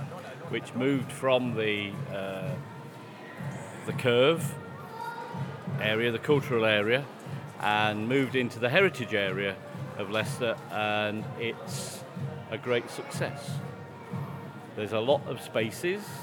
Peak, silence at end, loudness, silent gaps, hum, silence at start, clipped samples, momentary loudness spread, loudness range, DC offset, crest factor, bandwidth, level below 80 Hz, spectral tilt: -8 dBFS; 0 s; -30 LUFS; none; none; 0 s; under 0.1%; 15 LU; 6 LU; under 0.1%; 22 dB; 19 kHz; -80 dBFS; -5.5 dB/octave